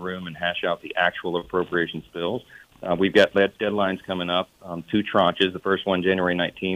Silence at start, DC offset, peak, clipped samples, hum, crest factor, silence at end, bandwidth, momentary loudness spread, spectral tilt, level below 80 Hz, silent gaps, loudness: 0 s; under 0.1%; -4 dBFS; under 0.1%; none; 18 dB; 0 s; 15.5 kHz; 9 LU; -6 dB/octave; -58 dBFS; none; -23 LUFS